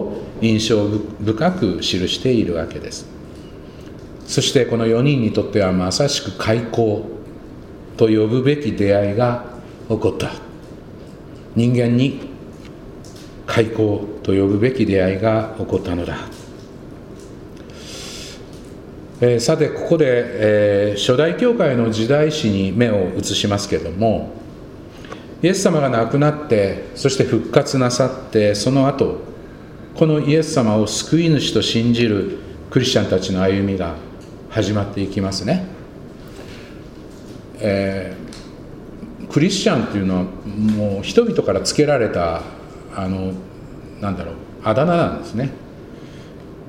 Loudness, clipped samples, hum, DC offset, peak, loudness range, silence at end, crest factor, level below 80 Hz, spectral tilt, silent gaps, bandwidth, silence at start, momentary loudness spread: -18 LUFS; under 0.1%; none; under 0.1%; 0 dBFS; 7 LU; 0 s; 18 dB; -44 dBFS; -5.5 dB/octave; none; 16 kHz; 0 s; 21 LU